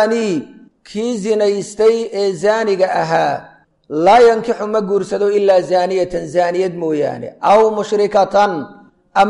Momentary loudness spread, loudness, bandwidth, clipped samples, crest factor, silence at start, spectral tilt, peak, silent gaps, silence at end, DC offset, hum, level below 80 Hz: 10 LU; -15 LUFS; 11.5 kHz; under 0.1%; 12 dB; 0 s; -5 dB/octave; -2 dBFS; none; 0 s; under 0.1%; none; -52 dBFS